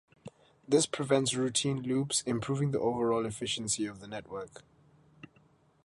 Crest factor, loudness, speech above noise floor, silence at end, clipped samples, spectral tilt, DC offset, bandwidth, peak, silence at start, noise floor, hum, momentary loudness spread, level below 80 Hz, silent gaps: 20 dB; -31 LUFS; 34 dB; 1.25 s; under 0.1%; -4 dB/octave; under 0.1%; 11.5 kHz; -14 dBFS; 0.25 s; -65 dBFS; none; 13 LU; -66 dBFS; none